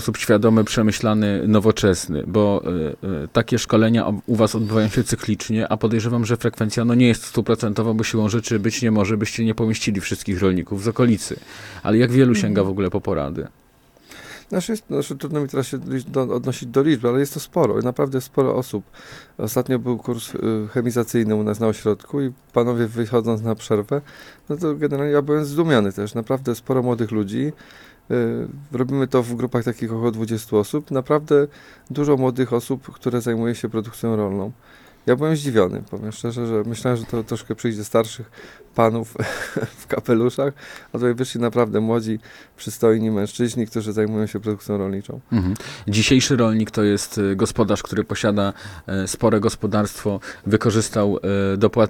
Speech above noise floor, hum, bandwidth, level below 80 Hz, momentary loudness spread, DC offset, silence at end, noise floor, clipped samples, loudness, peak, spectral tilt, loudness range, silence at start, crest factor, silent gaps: 33 dB; none; 17.5 kHz; -48 dBFS; 10 LU; under 0.1%; 0 s; -53 dBFS; under 0.1%; -21 LUFS; -2 dBFS; -6 dB/octave; 4 LU; 0 s; 20 dB; none